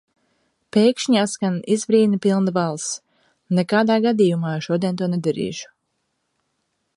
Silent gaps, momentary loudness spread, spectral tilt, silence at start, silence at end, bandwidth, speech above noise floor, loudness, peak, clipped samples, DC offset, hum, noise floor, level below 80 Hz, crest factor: none; 10 LU; -5.5 dB/octave; 0.75 s; 1.35 s; 11.5 kHz; 54 dB; -20 LUFS; -4 dBFS; under 0.1%; under 0.1%; none; -73 dBFS; -66 dBFS; 16 dB